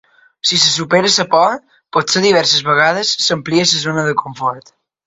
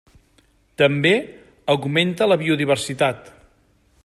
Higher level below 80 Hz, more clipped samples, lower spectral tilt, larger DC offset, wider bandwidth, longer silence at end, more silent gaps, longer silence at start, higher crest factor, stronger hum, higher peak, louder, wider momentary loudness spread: about the same, -56 dBFS vs -58 dBFS; neither; second, -2.5 dB/octave vs -5 dB/octave; neither; second, 8.4 kHz vs 14 kHz; second, 0.45 s vs 0.75 s; neither; second, 0.45 s vs 0.8 s; about the same, 16 dB vs 18 dB; neither; about the same, 0 dBFS vs -2 dBFS; first, -13 LUFS vs -19 LUFS; about the same, 9 LU vs 9 LU